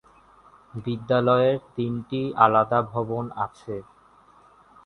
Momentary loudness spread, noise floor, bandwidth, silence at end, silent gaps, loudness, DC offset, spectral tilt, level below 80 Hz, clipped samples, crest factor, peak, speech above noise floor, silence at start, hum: 17 LU; -55 dBFS; 6.4 kHz; 1.05 s; none; -23 LUFS; under 0.1%; -8.5 dB/octave; -60 dBFS; under 0.1%; 24 dB; -2 dBFS; 32 dB; 0.75 s; none